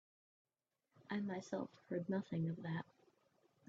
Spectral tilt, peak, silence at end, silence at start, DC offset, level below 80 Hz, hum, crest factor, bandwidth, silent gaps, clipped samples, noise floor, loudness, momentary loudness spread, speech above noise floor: -7 dB/octave; -28 dBFS; 0.85 s; 1 s; under 0.1%; -84 dBFS; none; 18 dB; 7.6 kHz; none; under 0.1%; -89 dBFS; -44 LUFS; 5 LU; 46 dB